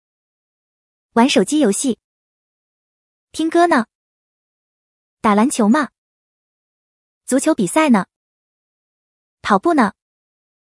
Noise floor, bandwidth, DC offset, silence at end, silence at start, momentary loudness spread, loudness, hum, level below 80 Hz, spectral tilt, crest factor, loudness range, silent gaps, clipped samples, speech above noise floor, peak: under -90 dBFS; 12 kHz; under 0.1%; 0.85 s; 1.15 s; 15 LU; -16 LUFS; none; -62 dBFS; -4.5 dB/octave; 20 dB; 3 LU; 2.04-3.28 s, 3.95-5.17 s, 5.98-7.21 s, 8.16-9.37 s; under 0.1%; over 75 dB; 0 dBFS